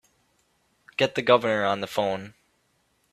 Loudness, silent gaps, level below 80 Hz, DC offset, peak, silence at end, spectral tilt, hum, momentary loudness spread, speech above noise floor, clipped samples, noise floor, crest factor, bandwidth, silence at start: -24 LUFS; none; -66 dBFS; under 0.1%; -4 dBFS; 0.85 s; -5 dB/octave; none; 14 LU; 45 dB; under 0.1%; -69 dBFS; 24 dB; 14 kHz; 1 s